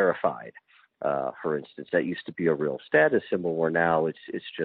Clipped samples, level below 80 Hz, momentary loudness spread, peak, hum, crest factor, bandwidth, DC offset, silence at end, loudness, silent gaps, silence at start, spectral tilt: under 0.1%; -68 dBFS; 11 LU; -8 dBFS; none; 20 dB; 4.7 kHz; under 0.1%; 0 s; -27 LUFS; none; 0 s; -4.5 dB/octave